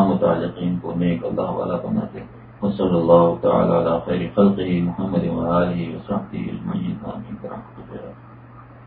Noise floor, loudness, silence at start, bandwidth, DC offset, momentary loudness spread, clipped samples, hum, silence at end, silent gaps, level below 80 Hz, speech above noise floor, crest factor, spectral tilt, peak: -42 dBFS; -21 LUFS; 0 s; 4.4 kHz; under 0.1%; 17 LU; under 0.1%; none; 0 s; none; -46 dBFS; 22 dB; 20 dB; -13 dB/octave; 0 dBFS